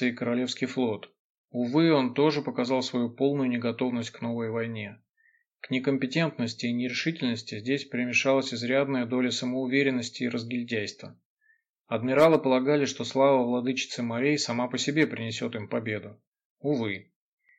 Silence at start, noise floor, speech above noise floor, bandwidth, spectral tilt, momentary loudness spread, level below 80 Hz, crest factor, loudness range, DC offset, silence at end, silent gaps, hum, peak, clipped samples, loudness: 0 s; -69 dBFS; 42 dB; 9.2 kHz; -5 dB/octave; 10 LU; -76 dBFS; 18 dB; 5 LU; under 0.1%; 0.55 s; 1.19-1.48 s, 5.09-5.14 s, 5.47-5.51 s, 11.25-11.37 s, 11.69-11.74 s, 16.27-16.32 s, 16.45-16.57 s; none; -8 dBFS; under 0.1%; -27 LUFS